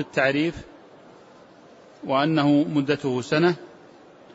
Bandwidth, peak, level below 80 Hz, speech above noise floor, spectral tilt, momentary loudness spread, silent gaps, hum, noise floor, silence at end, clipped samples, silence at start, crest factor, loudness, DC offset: 8 kHz; -8 dBFS; -58 dBFS; 27 dB; -6.5 dB/octave; 12 LU; none; none; -49 dBFS; 0.65 s; under 0.1%; 0 s; 18 dB; -23 LUFS; under 0.1%